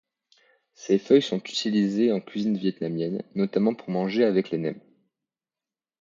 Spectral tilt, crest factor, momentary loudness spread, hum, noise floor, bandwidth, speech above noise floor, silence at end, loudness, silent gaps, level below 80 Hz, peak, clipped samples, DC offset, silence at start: -6.5 dB/octave; 20 dB; 9 LU; none; under -90 dBFS; 7.6 kHz; over 66 dB; 1.2 s; -25 LUFS; none; -72 dBFS; -6 dBFS; under 0.1%; under 0.1%; 0.8 s